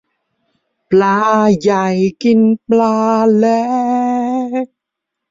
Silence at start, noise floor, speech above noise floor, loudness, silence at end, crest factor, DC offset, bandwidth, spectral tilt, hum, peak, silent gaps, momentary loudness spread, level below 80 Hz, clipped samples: 0.9 s; -79 dBFS; 67 dB; -13 LUFS; 0.65 s; 12 dB; under 0.1%; 7.6 kHz; -7 dB/octave; none; -2 dBFS; none; 6 LU; -56 dBFS; under 0.1%